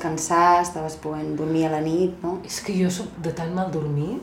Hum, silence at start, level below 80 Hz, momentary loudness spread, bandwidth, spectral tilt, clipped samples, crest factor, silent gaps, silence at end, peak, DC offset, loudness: none; 0 s; -52 dBFS; 12 LU; 16.5 kHz; -5.5 dB/octave; under 0.1%; 18 dB; none; 0 s; -4 dBFS; under 0.1%; -24 LUFS